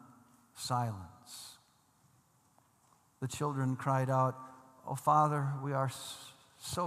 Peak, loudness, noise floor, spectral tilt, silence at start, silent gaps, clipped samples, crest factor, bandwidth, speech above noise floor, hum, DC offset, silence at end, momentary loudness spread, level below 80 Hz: -16 dBFS; -34 LUFS; -69 dBFS; -5.5 dB/octave; 0.05 s; none; under 0.1%; 20 dB; 14.5 kHz; 36 dB; none; under 0.1%; 0 s; 20 LU; -72 dBFS